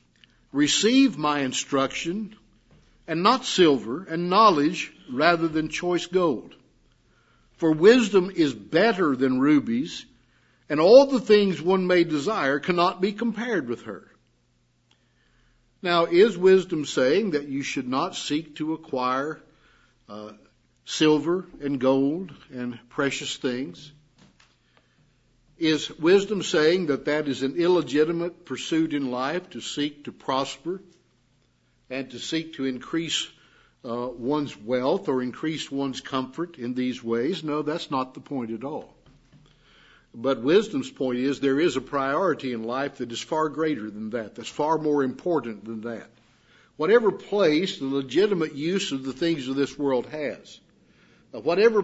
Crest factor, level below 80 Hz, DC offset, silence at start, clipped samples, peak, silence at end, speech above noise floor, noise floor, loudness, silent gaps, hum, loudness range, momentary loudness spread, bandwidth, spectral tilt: 22 dB; -64 dBFS; under 0.1%; 0.55 s; under 0.1%; -2 dBFS; 0 s; 43 dB; -66 dBFS; -24 LUFS; none; none; 9 LU; 14 LU; 8 kHz; -4.5 dB/octave